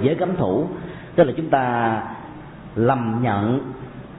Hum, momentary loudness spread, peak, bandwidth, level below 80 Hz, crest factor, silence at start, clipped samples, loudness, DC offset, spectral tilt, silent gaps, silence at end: none; 16 LU; -4 dBFS; 4 kHz; -50 dBFS; 18 dB; 0 s; under 0.1%; -21 LUFS; under 0.1%; -12.5 dB/octave; none; 0 s